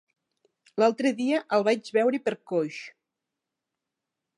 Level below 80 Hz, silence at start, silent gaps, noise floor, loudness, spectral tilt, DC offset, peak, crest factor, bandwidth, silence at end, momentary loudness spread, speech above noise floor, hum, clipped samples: -84 dBFS; 0.75 s; none; -86 dBFS; -26 LUFS; -5 dB/octave; under 0.1%; -8 dBFS; 20 dB; 11 kHz; 1.5 s; 13 LU; 61 dB; none; under 0.1%